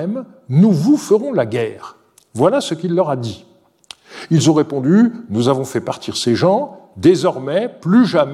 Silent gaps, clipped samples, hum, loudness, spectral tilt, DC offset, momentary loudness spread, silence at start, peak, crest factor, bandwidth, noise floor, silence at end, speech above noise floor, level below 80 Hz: none; under 0.1%; none; -16 LUFS; -6.5 dB/octave; under 0.1%; 14 LU; 0 s; 0 dBFS; 16 dB; 13 kHz; -42 dBFS; 0 s; 27 dB; -60 dBFS